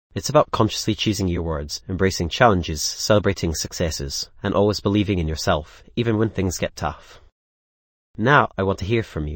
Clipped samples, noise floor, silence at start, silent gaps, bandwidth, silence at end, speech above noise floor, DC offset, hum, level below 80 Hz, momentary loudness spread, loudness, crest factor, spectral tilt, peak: under 0.1%; under -90 dBFS; 0.15 s; 7.32-8.14 s; 17 kHz; 0 s; over 69 dB; under 0.1%; none; -38 dBFS; 9 LU; -21 LUFS; 20 dB; -5 dB/octave; 0 dBFS